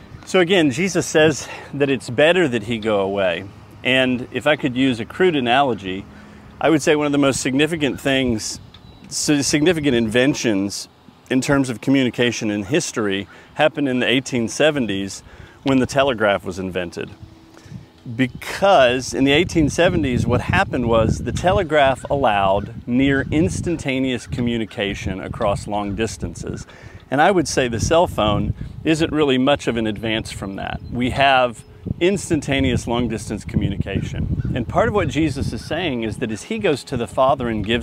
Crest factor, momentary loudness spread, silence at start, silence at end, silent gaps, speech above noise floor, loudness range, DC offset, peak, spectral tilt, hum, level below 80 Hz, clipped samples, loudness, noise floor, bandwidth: 18 dB; 11 LU; 0 s; 0 s; none; 20 dB; 4 LU; under 0.1%; 0 dBFS; -5 dB/octave; none; -38 dBFS; under 0.1%; -19 LUFS; -39 dBFS; 15.5 kHz